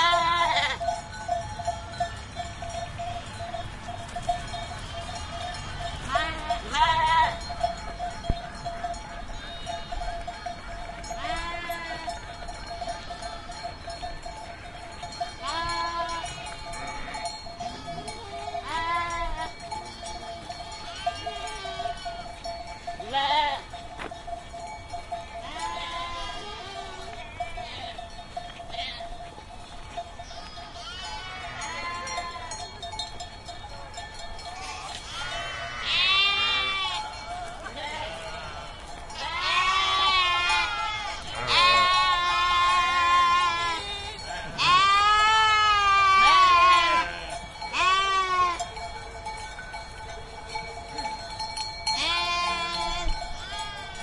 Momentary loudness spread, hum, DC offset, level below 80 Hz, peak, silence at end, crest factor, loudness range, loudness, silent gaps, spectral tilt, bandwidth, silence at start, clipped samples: 19 LU; none; under 0.1%; -44 dBFS; -6 dBFS; 0 s; 22 dB; 15 LU; -26 LUFS; none; -2 dB/octave; 12 kHz; 0 s; under 0.1%